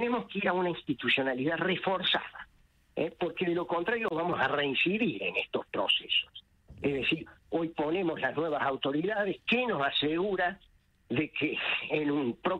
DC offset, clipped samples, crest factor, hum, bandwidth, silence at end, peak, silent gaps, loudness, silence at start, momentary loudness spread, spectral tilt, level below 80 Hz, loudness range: under 0.1%; under 0.1%; 18 dB; none; 9.4 kHz; 0 s; -14 dBFS; none; -30 LUFS; 0 s; 7 LU; -6.5 dB/octave; -64 dBFS; 1 LU